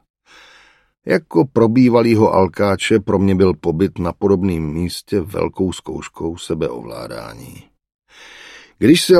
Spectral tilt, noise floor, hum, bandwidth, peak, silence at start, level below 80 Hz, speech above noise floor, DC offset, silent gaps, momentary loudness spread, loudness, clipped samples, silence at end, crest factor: -6 dB/octave; -50 dBFS; none; 15 kHz; 0 dBFS; 1.05 s; -44 dBFS; 34 dB; under 0.1%; 7.94-7.99 s; 17 LU; -17 LUFS; under 0.1%; 0 s; 16 dB